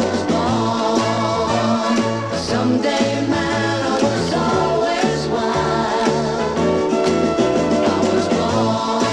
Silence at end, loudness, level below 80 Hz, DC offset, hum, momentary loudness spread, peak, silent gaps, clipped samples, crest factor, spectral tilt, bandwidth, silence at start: 0 s; -18 LUFS; -44 dBFS; under 0.1%; none; 2 LU; -2 dBFS; none; under 0.1%; 16 dB; -5 dB/octave; 11.5 kHz; 0 s